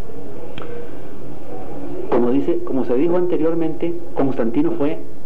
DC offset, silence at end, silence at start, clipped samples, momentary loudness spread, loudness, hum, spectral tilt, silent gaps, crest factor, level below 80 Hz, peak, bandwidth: 20%; 0 s; 0 s; under 0.1%; 17 LU; -20 LUFS; none; -9 dB/octave; none; 14 dB; -48 dBFS; -4 dBFS; 7.8 kHz